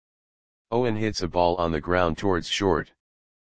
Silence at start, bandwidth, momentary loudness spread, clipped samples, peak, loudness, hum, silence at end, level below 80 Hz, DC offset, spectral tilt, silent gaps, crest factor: 0.65 s; 9.8 kHz; 5 LU; under 0.1%; -6 dBFS; -25 LUFS; none; 0.4 s; -46 dBFS; 1%; -5.5 dB/octave; none; 20 dB